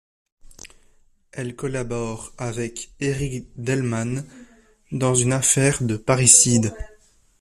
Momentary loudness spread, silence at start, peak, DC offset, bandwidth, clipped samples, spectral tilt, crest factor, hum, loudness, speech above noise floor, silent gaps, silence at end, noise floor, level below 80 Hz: 20 LU; 0.65 s; 0 dBFS; under 0.1%; 14.5 kHz; under 0.1%; -4 dB/octave; 22 dB; none; -20 LUFS; 35 dB; none; 0.55 s; -57 dBFS; -46 dBFS